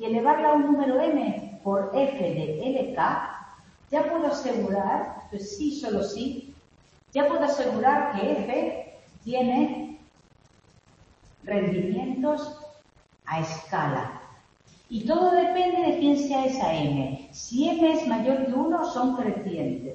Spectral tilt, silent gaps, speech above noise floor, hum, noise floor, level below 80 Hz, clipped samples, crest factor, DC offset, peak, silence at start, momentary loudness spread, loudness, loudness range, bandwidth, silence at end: -6 dB/octave; none; 34 dB; none; -59 dBFS; -60 dBFS; under 0.1%; 16 dB; under 0.1%; -8 dBFS; 0 s; 14 LU; -26 LUFS; 6 LU; 8.4 kHz; 0 s